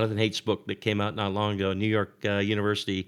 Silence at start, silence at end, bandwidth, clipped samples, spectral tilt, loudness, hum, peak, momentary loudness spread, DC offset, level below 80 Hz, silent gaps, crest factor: 0 s; 0.05 s; 12.5 kHz; under 0.1%; -6 dB/octave; -27 LUFS; none; -8 dBFS; 3 LU; under 0.1%; -70 dBFS; none; 18 dB